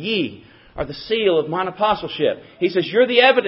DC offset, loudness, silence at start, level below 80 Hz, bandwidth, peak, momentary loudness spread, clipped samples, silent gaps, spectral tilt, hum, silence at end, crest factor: under 0.1%; -19 LUFS; 0 s; -50 dBFS; 5.8 kHz; 0 dBFS; 14 LU; under 0.1%; none; -8.5 dB/octave; none; 0 s; 20 dB